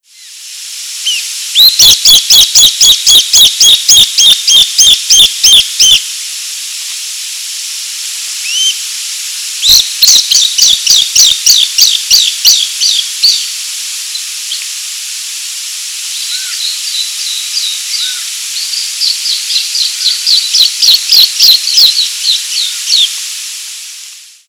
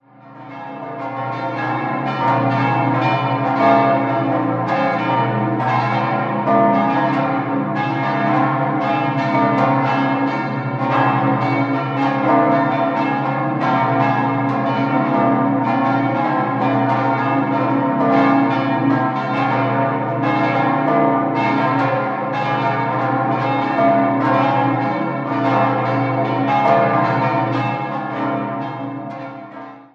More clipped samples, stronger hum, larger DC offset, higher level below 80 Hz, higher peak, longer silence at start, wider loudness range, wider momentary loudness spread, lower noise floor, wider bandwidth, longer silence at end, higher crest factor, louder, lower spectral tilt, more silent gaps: first, 5% vs under 0.1%; second, none vs 60 Hz at -50 dBFS; neither; first, -44 dBFS vs -64 dBFS; about the same, 0 dBFS vs -2 dBFS; about the same, 0.2 s vs 0.25 s; first, 12 LU vs 1 LU; first, 15 LU vs 7 LU; second, -31 dBFS vs -39 dBFS; first, over 20 kHz vs 6.8 kHz; first, 0.25 s vs 0.1 s; second, 10 dB vs 16 dB; first, -6 LUFS vs -17 LUFS; second, 3.5 dB/octave vs -8.5 dB/octave; neither